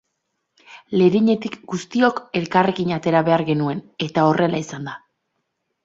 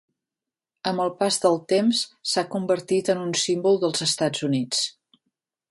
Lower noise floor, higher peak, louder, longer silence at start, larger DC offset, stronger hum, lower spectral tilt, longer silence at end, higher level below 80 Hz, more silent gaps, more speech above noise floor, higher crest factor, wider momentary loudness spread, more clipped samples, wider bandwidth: second, -75 dBFS vs -89 dBFS; first, -2 dBFS vs -6 dBFS; first, -20 LUFS vs -23 LUFS; second, 0.7 s vs 0.85 s; neither; neither; first, -6.5 dB/octave vs -3.5 dB/octave; about the same, 0.85 s vs 0.8 s; first, -60 dBFS vs -70 dBFS; neither; second, 56 dB vs 66 dB; about the same, 18 dB vs 18 dB; first, 12 LU vs 5 LU; neither; second, 7.8 kHz vs 11.5 kHz